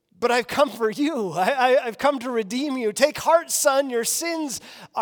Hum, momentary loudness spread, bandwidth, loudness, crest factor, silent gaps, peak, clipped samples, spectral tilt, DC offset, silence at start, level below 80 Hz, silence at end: none; 8 LU; over 20 kHz; -22 LUFS; 18 dB; none; -4 dBFS; under 0.1%; -2.5 dB/octave; under 0.1%; 0.2 s; -66 dBFS; 0 s